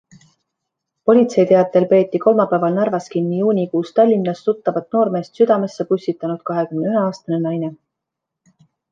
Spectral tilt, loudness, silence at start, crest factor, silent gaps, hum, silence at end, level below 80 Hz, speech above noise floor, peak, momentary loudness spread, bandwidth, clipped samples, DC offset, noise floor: -8 dB/octave; -17 LUFS; 1.05 s; 16 dB; none; none; 1.2 s; -68 dBFS; 65 dB; -2 dBFS; 8 LU; 7.6 kHz; under 0.1%; under 0.1%; -81 dBFS